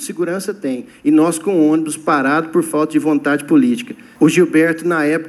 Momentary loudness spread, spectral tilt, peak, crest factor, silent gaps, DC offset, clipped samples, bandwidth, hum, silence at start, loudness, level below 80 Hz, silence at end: 9 LU; -5.5 dB/octave; 0 dBFS; 14 dB; none; under 0.1%; under 0.1%; 13 kHz; none; 0 s; -15 LUFS; -66 dBFS; 0 s